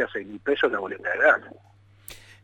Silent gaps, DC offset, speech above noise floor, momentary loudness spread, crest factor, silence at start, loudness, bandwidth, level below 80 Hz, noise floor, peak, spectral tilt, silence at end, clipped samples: none; under 0.1%; 22 dB; 24 LU; 20 dB; 0 s; -24 LUFS; 16 kHz; -62 dBFS; -47 dBFS; -6 dBFS; -4 dB/octave; 0.3 s; under 0.1%